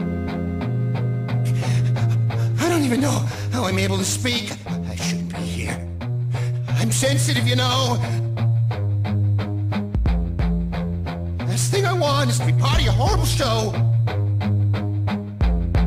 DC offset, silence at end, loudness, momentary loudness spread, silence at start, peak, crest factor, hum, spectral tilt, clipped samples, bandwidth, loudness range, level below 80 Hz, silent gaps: under 0.1%; 0 s; -21 LUFS; 7 LU; 0 s; -8 dBFS; 12 dB; none; -5.5 dB/octave; under 0.1%; 16 kHz; 4 LU; -32 dBFS; none